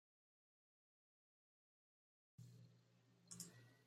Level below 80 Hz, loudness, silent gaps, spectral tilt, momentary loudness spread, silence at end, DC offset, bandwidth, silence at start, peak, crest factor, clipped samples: under -90 dBFS; -60 LUFS; none; -3 dB/octave; 10 LU; 0 s; under 0.1%; 15.5 kHz; 2.4 s; -38 dBFS; 30 dB; under 0.1%